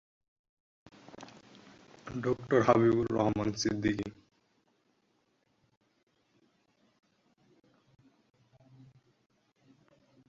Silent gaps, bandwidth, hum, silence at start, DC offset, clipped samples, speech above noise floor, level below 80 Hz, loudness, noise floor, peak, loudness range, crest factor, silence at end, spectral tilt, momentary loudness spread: none; 7.6 kHz; none; 1.2 s; under 0.1%; under 0.1%; 46 dB; -62 dBFS; -30 LUFS; -75 dBFS; -10 dBFS; 9 LU; 26 dB; 6.15 s; -6 dB/octave; 26 LU